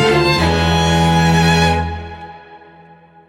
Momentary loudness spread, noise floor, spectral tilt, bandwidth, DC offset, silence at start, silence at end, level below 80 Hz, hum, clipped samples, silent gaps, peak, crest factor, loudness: 19 LU; -44 dBFS; -5 dB/octave; 14.5 kHz; under 0.1%; 0 s; 0.7 s; -32 dBFS; none; under 0.1%; none; -2 dBFS; 12 dB; -13 LUFS